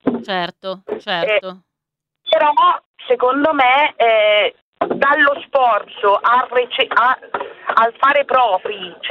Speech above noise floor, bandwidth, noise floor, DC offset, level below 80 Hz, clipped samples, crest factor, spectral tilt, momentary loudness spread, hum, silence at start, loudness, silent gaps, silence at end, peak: 66 dB; 6.6 kHz; -81 dBFS; under 0.1%; -64 dBFS; under 0.1%; 16 dB; -5.5 dB/octave; 12 LU; none; 0.05 s; -15 LUFS; 2.85-2.94 s, 4.62-4.73 s; 0 s; 0 dBFS